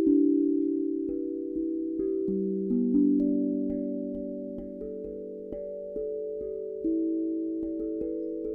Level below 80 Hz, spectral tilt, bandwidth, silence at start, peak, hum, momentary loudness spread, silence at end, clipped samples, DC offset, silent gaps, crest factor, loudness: -58 dBFS; -13.5 dB/octave; 1.3 kHz; 0 s; -14 dBFS; none; 13 LU; 0 s; under 0.1%; under 0.1%; none; 16 dB; -30 LUFS